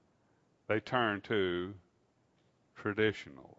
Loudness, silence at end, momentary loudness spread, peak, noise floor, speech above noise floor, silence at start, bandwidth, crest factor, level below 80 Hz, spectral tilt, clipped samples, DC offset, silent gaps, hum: -34 LUFS; 0.2 s; 13 LU; -14 dBFS; -73 dBFS; 39 dB; 0.7 s; 7.6 kHz; 22 dB; -72 dBFS; -3.5 dB/octave; under 0.1%; under 0.1%; none; none